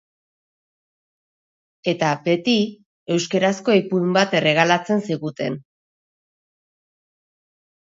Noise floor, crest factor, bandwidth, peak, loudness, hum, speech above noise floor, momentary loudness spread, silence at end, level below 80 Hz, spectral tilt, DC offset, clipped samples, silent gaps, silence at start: under -90 dBFS; 22 dB; 7.8 kHz; 0 dBFS; -20 LUFS; none; over 71 dB; 10 LU; 2.25 s; -70 dBFS; -5 dB/octave; under 0.1%; under 0.1%; 2.86-3.06 s; 1.85 s